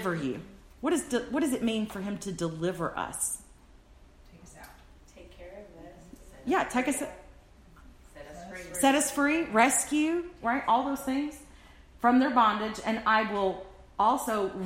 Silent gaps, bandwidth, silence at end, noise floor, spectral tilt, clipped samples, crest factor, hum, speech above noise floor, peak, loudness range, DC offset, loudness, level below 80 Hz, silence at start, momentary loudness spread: none; 16 kHz; 0 s; -55 dBFS; -3.5 dB/octave; under 0.1%; 20 dB; none; 27 dB; -10 dBFS; 10 LU; under 0.1%; -28 LUFS; -56 dBFS; 0 s; 22 LU